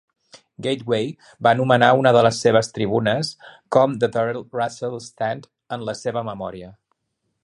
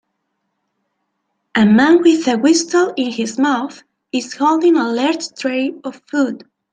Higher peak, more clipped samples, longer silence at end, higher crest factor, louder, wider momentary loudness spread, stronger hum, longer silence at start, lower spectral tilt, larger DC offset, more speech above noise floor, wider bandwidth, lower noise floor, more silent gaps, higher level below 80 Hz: about the same, 0 dBFS vs -2 dBFS; neither; first, 0.7 s vs 0.35 s; about the same, 20 dB vs 16 dB; second, -20 LUFS vs -15 LUFS; first, 15 LU vs 12 LU; neither; second, 0.35 s vs 1.55 s; about the same, -5.5 dB/octave vs -4.5 dB/octave; neither; about the same, 55 dB vs 57 dB; first, 11.5 kHz vs 9.4 kHz; about the same, -75 dBFS vs -72 dBFS; neither; about the same, -58 dBFS vs -62 dBFS